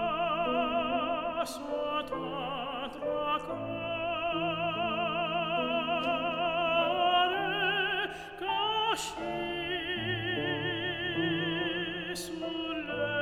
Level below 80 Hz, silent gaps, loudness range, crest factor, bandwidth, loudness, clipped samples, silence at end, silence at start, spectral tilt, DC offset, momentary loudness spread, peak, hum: -60 dBFS; none; 4 LU; 14 dB; 15.5 kHz; -31 LUFS; under 0.1%; 0 s; 0 s; -4 dB/octave; under 0.1%; 7 LU; -16 dBFS; none